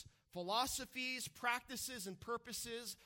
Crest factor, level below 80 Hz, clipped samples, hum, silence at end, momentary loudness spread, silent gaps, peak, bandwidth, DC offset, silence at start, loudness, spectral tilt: 20 dB; -70 dBFS; under 0.1%; none; 0 s; 8 LU; none; -24 dBFS; 17.5 kHz; under 0.1%; 0 s; -42 LUFS; -1.5 dB/octave